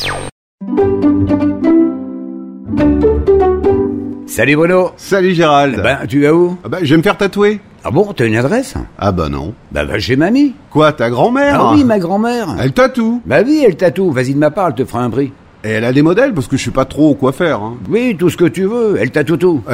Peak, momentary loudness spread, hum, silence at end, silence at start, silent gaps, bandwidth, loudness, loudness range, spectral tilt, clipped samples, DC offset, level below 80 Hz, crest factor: 0 dBFS; 10 LU; none; 0 s; 0 s; 0.32-0.58 s; 15.5 kHz; -12 LUFS; 2 LU; -6.5 dB/octave; under 0.1%; under 0.1%; -32 dBFS; 12 dB